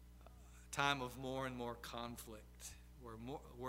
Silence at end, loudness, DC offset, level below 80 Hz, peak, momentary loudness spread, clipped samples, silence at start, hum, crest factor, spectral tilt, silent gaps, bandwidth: 0 s; -45 LUFS; under 0.1%; -62 dBFS; -20 dBFS; 22 LU; under 0.1%; 0 s; 60 Hz at -60 dBFS; 28 dB; -4 dB/octave; none; 16 kHz